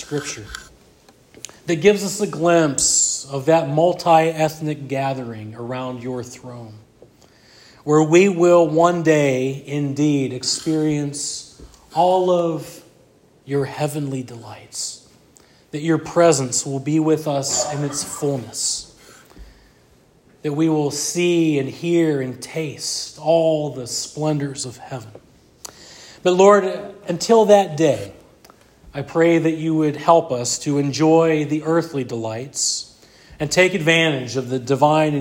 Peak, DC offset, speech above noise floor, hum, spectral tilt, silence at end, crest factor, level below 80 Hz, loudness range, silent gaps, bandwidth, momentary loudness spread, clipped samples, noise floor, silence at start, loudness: 0 dBFS; under 0.1%; 35 dB; none; -4.5 dB/octave; 0 s; 20 dB; -56 dBFS; 7 LU; none; 16.5 kHz; 17 LU; under 0.1%; -54 dBFS; 0 s; -19 LUFS